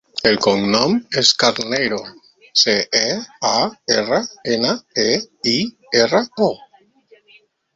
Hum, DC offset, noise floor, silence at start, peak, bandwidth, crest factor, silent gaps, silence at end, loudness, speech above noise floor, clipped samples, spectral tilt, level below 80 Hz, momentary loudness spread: none; under 0.1%; -53 dBFS; 0.15 s; 0 dBFS; 8 kHz; 18 dB; none; 1.2 s; -17 LUFS; 35 dB; under 0.1%; -3 dB/octave; -56 dBFS; 7 LU